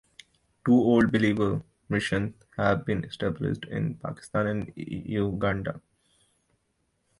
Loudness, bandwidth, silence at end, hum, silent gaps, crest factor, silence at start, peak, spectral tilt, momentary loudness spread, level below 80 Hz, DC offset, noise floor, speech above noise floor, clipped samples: -27 LUFS; 11.5 kHz; 1.4 s; none; none; 18 dB; 0.65 s; -10 dBFS; -7.5 dB/octave; 13 LU; -52 dBFS; under 0.1%; -74 dBFS; 48 dB; under 0.1%